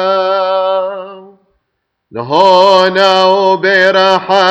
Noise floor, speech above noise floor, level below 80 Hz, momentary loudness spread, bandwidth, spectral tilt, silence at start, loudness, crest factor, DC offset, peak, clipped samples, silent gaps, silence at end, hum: -69 dBFS; 61 dB; -58 dBFS; 16 LU; 8.4 kHz; -4 dB/octave; 0 s; -9 LUFS; 10 dB; under 0.1%; 0 dBFS; under 0.1%; none; 0 s; none